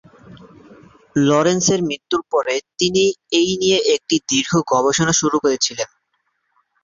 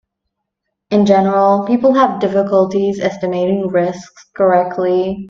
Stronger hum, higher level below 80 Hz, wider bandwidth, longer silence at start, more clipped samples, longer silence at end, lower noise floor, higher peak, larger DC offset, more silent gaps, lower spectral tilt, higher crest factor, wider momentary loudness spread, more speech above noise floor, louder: neither; about the same, -54 dBFS vs -54 dBFS; about the same, 7.6 kHz vs 7.4 kHz; second, 0.3 s vs 0.9 s; neither; first, 1 s vs 0 s; second, -69 dBFS vs -76 dBFS; about the same, -2 dBFS vs 0 dBFS; neither; neither; second, -3.5 dB/octave vs -7.5 dB/octave; about the same, 16 dB vs 14 dB; about the same, 6 LU vs 7 LU; second, 52 dB vs 62 dB; second, -17 LUFS vs -14 LUFS